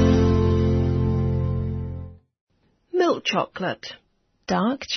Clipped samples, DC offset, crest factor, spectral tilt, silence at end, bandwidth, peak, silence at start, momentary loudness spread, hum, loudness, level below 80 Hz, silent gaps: under 0.1%; under 0.1%; 16 dB; -7 dB/octave; 0 s; 6.4 kHz; -6 dBFS; 0 s; 16 LU; none; -23 LUFS; -36 dBFS; 2.41-2.47 s